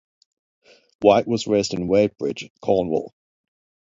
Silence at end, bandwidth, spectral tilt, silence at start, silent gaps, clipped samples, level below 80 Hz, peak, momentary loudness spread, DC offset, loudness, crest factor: 0.9 s; 7.8 kHz; -5.5 dB/octave; 1 s; 2.50-2.55 s; under 0.1%; -54 dBFS; 0 dBFS; 11 LU; under 0.1%; -21 LUFS; 22 dB